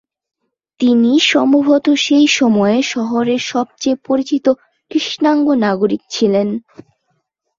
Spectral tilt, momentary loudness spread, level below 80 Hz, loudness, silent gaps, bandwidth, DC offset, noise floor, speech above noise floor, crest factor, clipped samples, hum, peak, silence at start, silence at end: -4 dB/octave; 8 LU; -60 dBFS; -14 LUFS; none; 7.6 kHz; under 0.1%; -67 dBFS; 53 dB; 14 dB; under 0.1%; none; -2 dBFS; 0.8 s; 1 s